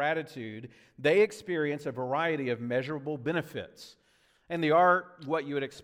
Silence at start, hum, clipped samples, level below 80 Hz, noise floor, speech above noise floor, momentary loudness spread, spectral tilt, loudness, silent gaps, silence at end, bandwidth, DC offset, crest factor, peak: 0 s; none; under 0.1%; -74 dBFS; -66 dBFS; 37 dB; 17 LU; -6 dB/octave; -29 LUFS; none; 0 s; 15.5 kHz; under 0.1%; 18 dB; -12 dBFS